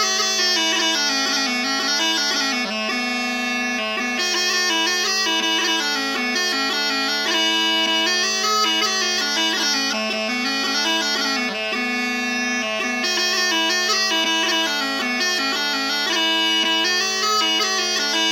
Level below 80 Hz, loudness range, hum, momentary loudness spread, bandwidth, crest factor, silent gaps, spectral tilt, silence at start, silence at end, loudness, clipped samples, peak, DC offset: -80 dBFS; 2 LU; none; 4 LU; 19 kHz; 14 dB; none; 0 dB/octave; 0 s; 0 s; -18 LUFS; under 0.1%; -6 dBFS; under 0.1%